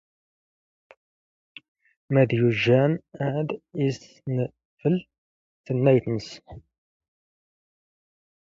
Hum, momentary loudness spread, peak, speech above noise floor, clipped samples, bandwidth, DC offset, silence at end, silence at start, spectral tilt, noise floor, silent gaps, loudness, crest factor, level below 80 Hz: none; 12 LU; -6 dBFS; over 67 dB; under 0.1%; 7.6 kHz; under 0.1%; 1.9 s; 2.1 s; -8 dB/octave; under -90 dBFS; 4.65-4.77 s, 5.18-5.64 s; -24 LUFS; 20 dB; -62 dBFS